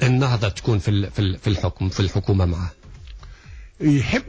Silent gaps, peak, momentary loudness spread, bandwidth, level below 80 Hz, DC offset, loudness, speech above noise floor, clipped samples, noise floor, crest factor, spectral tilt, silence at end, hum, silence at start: none; -6 dBFS; 12 LU; 8 kHz; -32 dBFS; under 0.1%; -22 LUFS; 21 dB; under 0.1%; -41 dBFS; 14 dB; -6.5 dB/octave; 0 s; none; 0 s